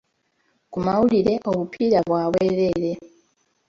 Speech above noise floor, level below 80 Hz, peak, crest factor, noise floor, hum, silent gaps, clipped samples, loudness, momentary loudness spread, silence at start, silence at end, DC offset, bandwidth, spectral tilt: 48 dB; -52 dBFS; -6 dBFS; 16 dB; -68 dBFS; none; none; under 0.1%; -21 LUFS; 9 LU; 0.7 s; 0.6 s; under 0.1%; 7.6 kHz; -8 dB/octave